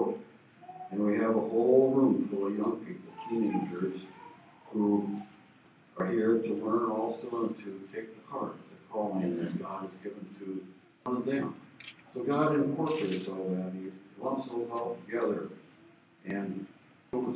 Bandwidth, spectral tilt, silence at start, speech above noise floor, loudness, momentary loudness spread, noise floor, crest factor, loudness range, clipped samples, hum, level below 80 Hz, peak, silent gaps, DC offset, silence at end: 4 kHz; -7 dB/octave; 0 s; 29 dB; -32 LUFS; 17 LU; -60 dBFS; 20 dB; 8 LU; under 0.1%; none; -76 dBFS; -12 dBFS; none; under 0.1%; 0 s